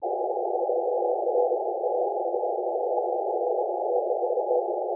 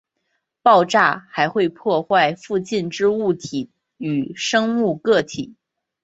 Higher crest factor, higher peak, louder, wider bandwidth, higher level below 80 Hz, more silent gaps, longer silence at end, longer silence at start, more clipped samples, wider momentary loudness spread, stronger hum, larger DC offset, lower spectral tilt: about the same, 14 dB vs 18 dB; second, -12 dBFS vs -2 dBFS; second, -27 LUFS vs -19 LUFS; second, 1 kHz vs 8.2 kHz; second, under -90 dBFS vs -62 dBFS; neither; second, 0 s vs 0.5 s; second, 0 s vs 0.65 s; neither; second, 3 LU vs 14 LU; neither; neither; first, -10.5 dB/octave vs -4.5 dB/octave